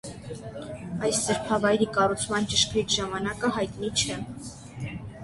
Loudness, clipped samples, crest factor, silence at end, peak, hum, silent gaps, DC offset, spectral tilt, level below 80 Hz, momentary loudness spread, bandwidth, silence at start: -26 LUFS; under 0.1%; 20 dB; 0 s; -8 dBFS; none; none; under 0.1%; -3.5 dB/octave; -50 dBFS; 15 LU; 12 kHz; 0.05 s